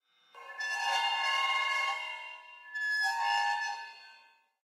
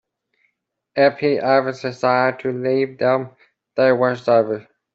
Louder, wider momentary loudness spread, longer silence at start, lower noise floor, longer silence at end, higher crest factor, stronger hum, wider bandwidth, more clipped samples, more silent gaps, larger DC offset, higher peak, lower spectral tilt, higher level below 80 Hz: second, -31 LUFS vs -19 LUFS; first, 18 LU vs 10 LU; second, 0.35 s vs 0.95 s; second, -62 dBFS vs -72 dBFS; about the same, 0.45 s vs 0.35 s; about the same, 16 dB vs 18 dB; neither; first, 16 kHz vs 7.6 kHz; neither; neither; neither; second, -18 dBFS vs -2 dBFS; second, 5 dB/octave vs -7 dB/octave; second, under -90 dBFS vs -66 dBFS